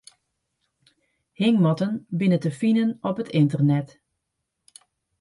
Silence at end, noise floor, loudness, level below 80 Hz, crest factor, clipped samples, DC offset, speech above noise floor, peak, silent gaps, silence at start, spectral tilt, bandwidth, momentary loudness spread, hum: 1.35 s; -80 dBFS; -22 LUFS; -68 dBFS; 16 dB; under 0.1%; under 0.1%; 58 dB; -8 dBFS; none; 1.4 s; -8 dB/octave; 11.5 kHz; 7 LU; none